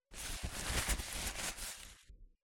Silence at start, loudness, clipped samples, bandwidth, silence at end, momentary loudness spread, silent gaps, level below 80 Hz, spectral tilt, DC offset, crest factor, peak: 0.1 s; -40 LUFS; under 0.1%; 18 kHz; 0.15 s; 14 LU; none; -46 dBFS; -2 dB/octave; under 0.1%; 20 dB; -22 dBFS